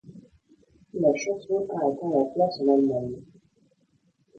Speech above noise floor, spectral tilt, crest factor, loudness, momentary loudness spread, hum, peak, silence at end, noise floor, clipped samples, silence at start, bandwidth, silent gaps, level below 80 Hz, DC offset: 43 dB; -6.5 dB/octave; 18 dB; -25 LUFS; 12 LU; none; -8 dBFS; 1.15 s; -67 dBFS; under 0.1%; 0.05 s; 7.4 kHz; none; -66 dBFS; under 0.1%